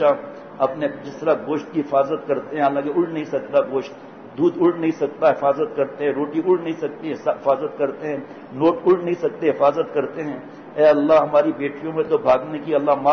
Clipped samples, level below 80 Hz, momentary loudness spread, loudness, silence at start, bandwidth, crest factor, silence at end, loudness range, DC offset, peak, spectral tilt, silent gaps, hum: under 0.1%; -64 dBFS; 10 LU; -21 LUFS; 0 s; 6.4 kHz; 14 dB; 0 s; 3 LU; under 0.1%; -6 dBFS; -7.5 dB/octave; none; none